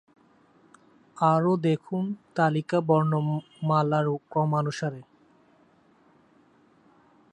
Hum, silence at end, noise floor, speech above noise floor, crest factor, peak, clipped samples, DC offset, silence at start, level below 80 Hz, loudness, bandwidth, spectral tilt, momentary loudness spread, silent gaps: none; 2.3 s; -61 dBFS; 36 dB; 18 dB; -8 dBFS; under 0.1%; under 0.1%; 1.15 s; -72 dBFS; -26 LUFS; 9.2 kHz; -8 dB/octave; 8 LU; none